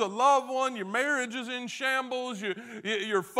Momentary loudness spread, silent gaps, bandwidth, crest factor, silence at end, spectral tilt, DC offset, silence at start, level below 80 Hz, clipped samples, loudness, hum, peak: 11 LU; none; 16 kHz; 18 dB; 0 s; -3 dB/octave; under 0.1%; 0 s; -86 dBFS; under 0.1%; -29 LUFS; none; -10 dBFS